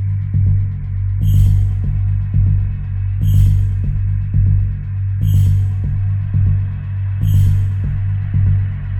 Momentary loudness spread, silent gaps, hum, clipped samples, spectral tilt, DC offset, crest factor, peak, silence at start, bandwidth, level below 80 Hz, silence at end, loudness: 7 LU; none; none; under 0.1%; -8.5 dB/octave; under 0.1%; 12 dB; -2 dBFS; 0 s; 13.5 kHz; -22 dBFS; 0 s; -17 LUFS